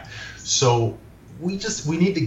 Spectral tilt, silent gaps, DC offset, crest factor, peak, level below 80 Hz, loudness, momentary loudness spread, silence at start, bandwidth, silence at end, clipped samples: -4.5 dB/octave; none; under 0.1%; 18 dB; -6 dBFS; -50 dBFS; -22 LUFS; 16 LU; 0 s; 8.4 kHz; 0 s; under 0.1%